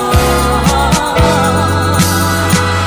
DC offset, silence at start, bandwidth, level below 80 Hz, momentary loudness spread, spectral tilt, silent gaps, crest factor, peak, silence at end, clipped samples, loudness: under 0.1%; 0 s; 16 kHz; -20 dBFS; 2 LU; -4.5 dB/octave; none; 10 dB; 0 dBFS; 0 s; under 0.1%; -11 LUFS